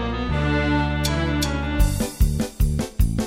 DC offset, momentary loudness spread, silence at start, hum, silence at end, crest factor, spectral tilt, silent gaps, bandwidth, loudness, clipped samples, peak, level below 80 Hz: under 0.1%; 3 LU; 0 s; none; 0 s; 14 dB; -5.5 dB/octave; none; 16.5 kHz; -23 LUFS; under 0.1%; -6 dBFS; -24 dBFS